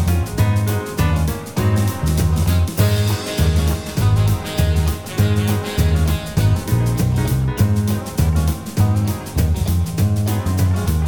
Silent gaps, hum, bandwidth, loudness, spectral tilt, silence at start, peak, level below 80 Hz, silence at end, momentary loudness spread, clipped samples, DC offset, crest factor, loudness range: none; none; 19.5 kHz; -18 LUFS; -6 dB/octave; 0 s; -2 dBFS; -24 dBFS; 0 s; 3 LU; under 0.1%; 0.6%; 14 dB; 1 LU